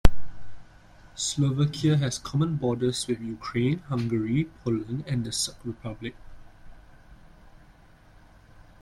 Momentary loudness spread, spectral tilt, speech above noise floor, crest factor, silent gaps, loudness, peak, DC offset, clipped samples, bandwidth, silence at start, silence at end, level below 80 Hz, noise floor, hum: 12 LU; -5.5 dB/octave; 27 dB; 24 dB; none; -28 LUFS; -2 dBFS; under 0.1%; under 0.1%; 13.5 kHz; 0.05 s; 1.65 s; -36 dBFS; -54 dBFS; none